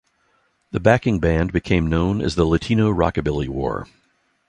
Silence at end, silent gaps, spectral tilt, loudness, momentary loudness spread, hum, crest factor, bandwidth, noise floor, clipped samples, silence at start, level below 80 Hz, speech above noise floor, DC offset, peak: 0.65 s; none; -7.5 dB/octave; -20 LUFS; 8 LU; none; 18 dB; 10 kHz; -64 dBFS; under 0.1%; 0.75 s; -34 dBFS; 45 dB; under 0.1%; -2 dBFS